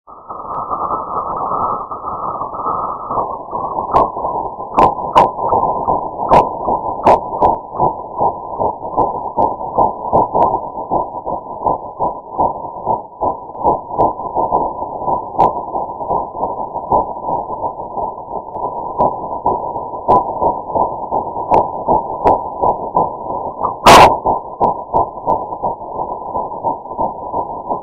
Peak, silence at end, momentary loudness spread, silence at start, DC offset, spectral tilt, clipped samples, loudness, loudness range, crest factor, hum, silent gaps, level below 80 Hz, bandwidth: 0 dBFS; 0 s; 10 LU; 0.1 s; under 0.1%; -5 dB/octave; 0.1%; -17 LUFS; 7 LU; 16 dB; none; none; -40 dBFS; 13 kHz